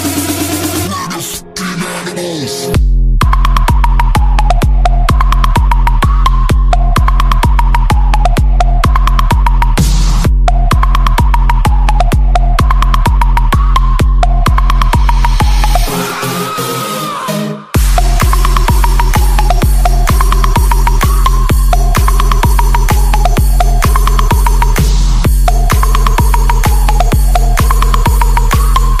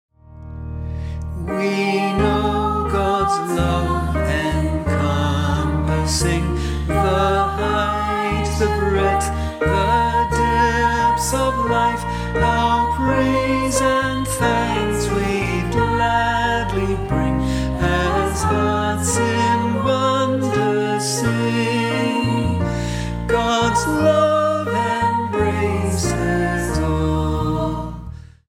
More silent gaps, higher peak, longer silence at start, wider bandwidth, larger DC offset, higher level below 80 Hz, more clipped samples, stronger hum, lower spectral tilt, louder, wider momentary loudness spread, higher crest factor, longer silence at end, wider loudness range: neither; first, 0 dBFS vs -4 dBFS; second, 0 s vs 0.3 s; about the same, 15.5 kHz vs 16 kHz; neither; first, -8 dBFS vs -28 dBFS; neither; neither; about the same, -5 dB/octave vs -5.5 dB/octave; first, -12 LUFS vs -19 LUFS; about the same, 4 LU vs 5 LU; second, 8 dB vs 16 dB; second, 0 s vs 0.2 s; about the same, 2 LU vs 2 LU